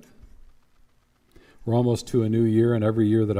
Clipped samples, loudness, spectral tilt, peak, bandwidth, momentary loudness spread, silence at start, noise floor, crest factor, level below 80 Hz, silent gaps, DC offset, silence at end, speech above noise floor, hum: under 0.1%; -22 LUFS; -8 dB/octave; -10 dBFS; 12.5 kHz; 4 LU; 1.6 s; -62 dBFS; 14 dB; -54 dBFS; none; under 0.1%; 0 s; 41 dB; none